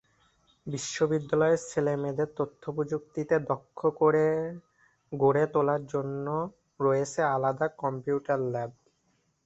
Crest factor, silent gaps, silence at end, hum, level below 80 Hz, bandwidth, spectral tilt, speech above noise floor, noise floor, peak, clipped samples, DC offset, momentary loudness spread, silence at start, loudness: 18 dB; none; 0.75 s; none; -66 dBFS; 8.2 kHz; -6 dB/octave; 44 dB; -72 dBFS; -10 dBFS; under 0.1%; under 0.1%; 11 LU; 0.65 s; -29 LUFS